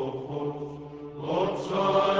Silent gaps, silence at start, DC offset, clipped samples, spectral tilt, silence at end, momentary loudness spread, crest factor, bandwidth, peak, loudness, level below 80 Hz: none; 0 s; under 0.1%; under 0.1%; -6.5 dB/octave; 0 s; 15 LU; 18 dB; 8 kHz; -10 dBFS; -29 LUFS; -60 dBFS